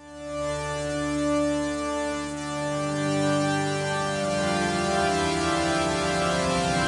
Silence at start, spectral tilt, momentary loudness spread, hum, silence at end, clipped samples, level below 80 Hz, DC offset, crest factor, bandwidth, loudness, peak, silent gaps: 0 s; -4.5 dB/octave; 6 LU; none; 0 s; under 0.1%; -48 dBFS; under 0.1%; 14 dB; 11.5 kHz; -26 LUFS; -12 dBFS; none